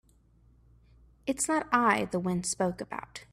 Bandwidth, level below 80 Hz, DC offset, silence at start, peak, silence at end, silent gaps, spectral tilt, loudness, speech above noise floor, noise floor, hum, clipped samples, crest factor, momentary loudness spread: 14.5 kHz; -60 dBFS; under 0.1%; 1.25 s; -12 dBFS; 0.1 s; none; -4 dB/octave; -29 LUFS; 33 dB; -62 dBFS; none; under 0.1%; 20 dB; 14 LU